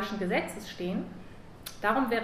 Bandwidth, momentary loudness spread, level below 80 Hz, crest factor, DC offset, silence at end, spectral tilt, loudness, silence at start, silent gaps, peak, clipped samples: 15.5 kHz; 17 LU; -56 dBFS; 20 dB; under 0.1%; 0 s; -5.5 dB/octave; -31 LUFS; 0 s; none; -12 dBFS; under 0.1%